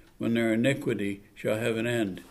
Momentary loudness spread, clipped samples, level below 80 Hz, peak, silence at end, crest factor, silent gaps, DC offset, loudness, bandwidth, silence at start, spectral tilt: 7 LU; under 0.1%; -60 dBFS; -12 dBFS; 0 s; 18 dB; none; under 0.1%; -28 LUFS; 15 kHz; 0.2 s; -6 dB/octave